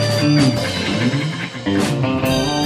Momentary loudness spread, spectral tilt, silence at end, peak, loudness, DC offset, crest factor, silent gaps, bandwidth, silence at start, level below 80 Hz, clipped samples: 7 LU; -5.5 dB/octave; 0 s; -2 dBFS; -18 LUFS; under 0.1%; 14 dB; none; 15.5 kHz; 0 s; -42 dBFS; under 0.1%